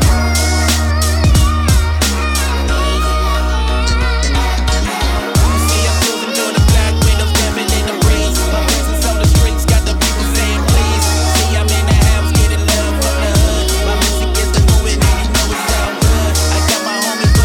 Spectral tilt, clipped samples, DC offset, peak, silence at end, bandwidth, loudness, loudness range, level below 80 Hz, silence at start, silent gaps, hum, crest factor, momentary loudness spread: -4 dB/octave; under 0.1%; under 0.1%; 0 dBFS; 0 s; 18 kHz; -13 LUFS; 2 LU; -14 dBFS; 0 s; none; none; 12 dB; 4 LU